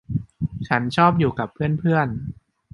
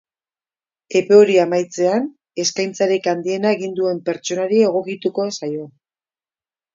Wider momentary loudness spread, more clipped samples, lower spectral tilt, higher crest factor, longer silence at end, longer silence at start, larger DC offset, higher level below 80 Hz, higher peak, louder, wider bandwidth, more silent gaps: about the same, 12 LU vs 11 LU; neither; first, -8 dB/octave vs -4.5 dB/octave; about the same, 20 dB vs 18 dB; second, 0.4 s vs 1.05 s; second, 0.1 s vs 0.9 s; neither; first, -46 dBFS vs -70 dBFS; about the same, -2 dBFS vs 0 dBFS; second, -21 LUFS vs -18 LUFS; first, 11.5 kHz vs 7.6 kHz; neither